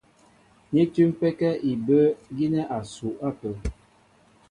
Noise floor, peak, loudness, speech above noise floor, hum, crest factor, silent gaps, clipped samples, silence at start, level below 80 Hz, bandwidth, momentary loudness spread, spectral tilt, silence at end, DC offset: -59 dBFS; -8 dBFS; -25 LUFS; 35 dB; none; 16 dB; none; under 0.1%; 0.7 s; -46 dBFS; 11 kHz; 13 LU; -8 dB/octave; 0.75 s; under 0.1%